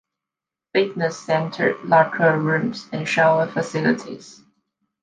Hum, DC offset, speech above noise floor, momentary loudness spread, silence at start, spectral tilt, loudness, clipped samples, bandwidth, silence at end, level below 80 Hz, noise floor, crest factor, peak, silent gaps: none; under 0.1%; 67 dB; 9 LU; 0.75 s; -6 dB/octave; -20 LUFS; under 0.1%; 9.6 kHz; 0.7 s; -66 dBFS; -88 dBFS; 20 dB; -2 dBFS; none